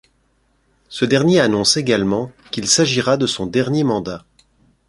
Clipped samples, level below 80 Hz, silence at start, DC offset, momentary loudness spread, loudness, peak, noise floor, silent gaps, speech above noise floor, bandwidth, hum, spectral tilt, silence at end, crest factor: under 0.1%; -52 dBFS; 0.9 s; under 0.1%; 12 LU; -17 LUFS; 0 dBFS; -62 dBFS; none; 45 dB; 11.5 kHz; none; -4 dB/octave; 0.7 s; 18 dB